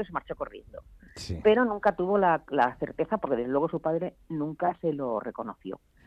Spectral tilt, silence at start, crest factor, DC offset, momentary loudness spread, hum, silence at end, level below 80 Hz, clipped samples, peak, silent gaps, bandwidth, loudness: -7 dB/octave; 0 s; 18 dB; under 0.1%; 15 LU; none; 0.3 s; -56 dBFS; under 0.1%; -10 dBFS; none; 10.5 kHz; -28 LUFS